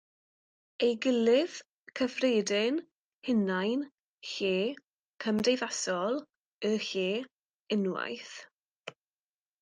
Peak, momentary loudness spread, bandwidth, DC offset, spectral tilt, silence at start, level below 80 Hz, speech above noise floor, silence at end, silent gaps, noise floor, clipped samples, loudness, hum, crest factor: -16 dBFS; 19 LU; 10 kHz; under 0.1%; -4 dB/octave; 0.8 s; -78 dBFS; over 60 dB; 0.7 s; 1.73-1.86 s, 2.91-3.22 s, 3.99-4.18 s, 4.86-5.18 s, 6.36-6.41 s, 6.47-6.59 s, 7.31-7.66 s, 8.54-8.81 s; under -90 dBFS; under 0.1%; -31 LUFS; none; 16 dB